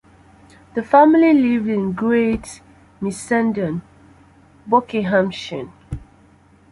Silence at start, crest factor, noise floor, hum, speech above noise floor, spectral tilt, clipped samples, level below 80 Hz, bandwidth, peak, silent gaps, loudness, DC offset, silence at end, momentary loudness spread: 0.75 s; 18 dB; -51 dBFS; none; 34 dB; -6.5 dB/octave; under 0.1%; -48 dBFS; 11.5 kHz; -2 dBFS; none; -18 LUFS; under 0.1%; 0.75 s; 19 LU